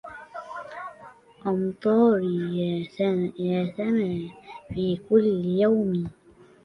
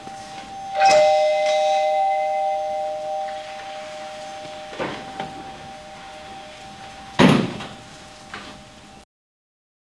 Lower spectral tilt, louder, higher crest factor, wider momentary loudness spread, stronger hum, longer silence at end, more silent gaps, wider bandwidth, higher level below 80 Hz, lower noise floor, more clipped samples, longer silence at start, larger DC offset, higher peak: first, -9 dB/octave vs -5 dB/octave; second, -25 LUFS vs -20 LUFS; second, 18 dB vs 24 dB; second, 17 LU vs 22 LU; neither; second, 0.55 s vs 0.95 s; neither; second, 6 kHz vs 12 kHz; about the same, -58 dBFS vs -56 dBFS; first, -49 dBFS vs -43 dBFS; neither; about the same, 0.05 s vs 0 s; neither; second, -8 dBFS vs 0 dBFS